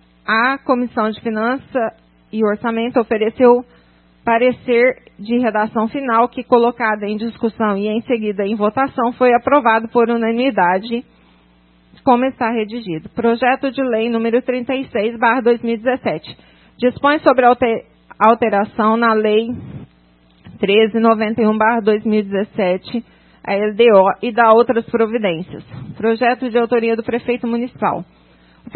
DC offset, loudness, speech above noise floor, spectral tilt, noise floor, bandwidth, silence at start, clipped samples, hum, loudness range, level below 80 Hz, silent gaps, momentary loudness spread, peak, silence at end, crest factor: under 0.1%; -16 LUFS; 36 dB; -9.5 dB/octave; -52 dBFS; 4.4 kHz; 0.3 s; under 0.1%; none; 3 LU; -56 dBFS; none; 10 LU; 0 dBFS; 0.7 s; 16 dB